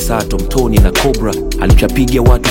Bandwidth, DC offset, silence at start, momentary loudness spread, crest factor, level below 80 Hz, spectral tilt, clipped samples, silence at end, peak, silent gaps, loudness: 17 kHz; under 0.1%; 0 s; 6 LU; 10 dB; -14 dBFS; -5.5 dB/octave; 0.5%; 0 s; 0 dBFS; none; -12 LUFS